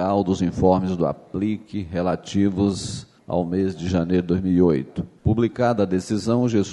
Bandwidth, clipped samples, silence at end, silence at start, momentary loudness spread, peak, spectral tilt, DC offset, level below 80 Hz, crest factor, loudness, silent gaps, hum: 11 kHz; under 0.1%; 0 s; 0 s; 8 LU; -4 dBFS; -7 dB/octave; under 0.1%; -46 dBFS; 18 dB; -22 LUFS; none; none